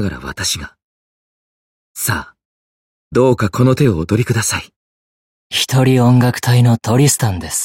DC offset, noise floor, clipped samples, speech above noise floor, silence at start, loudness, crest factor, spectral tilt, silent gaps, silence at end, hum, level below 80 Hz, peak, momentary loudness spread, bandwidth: under 0.1%; under -90 dBFS; under 0.1%; over 76 dB; 0 s; -15 LUFS; 14 dB; -5 dB/octave; 0.84-1.95 s, 2.45-3.11 s, 4.76-5.50 s; 0 s; none; -42 dBFS; -2 dBFS; 11 LU; 16.5 kHz